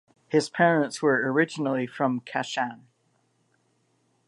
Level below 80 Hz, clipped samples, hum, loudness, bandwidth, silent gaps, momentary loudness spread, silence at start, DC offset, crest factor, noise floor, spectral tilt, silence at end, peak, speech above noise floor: -80 dBFS; under 0.1%; none; -25 LUFS; 11.5 kHz; none; 8 LU; 0.3 s; under 0.1%; 20 dB; -69 dBFS; -5.5 dB/octave; 1.55 s; -6 dBFS; 45 dB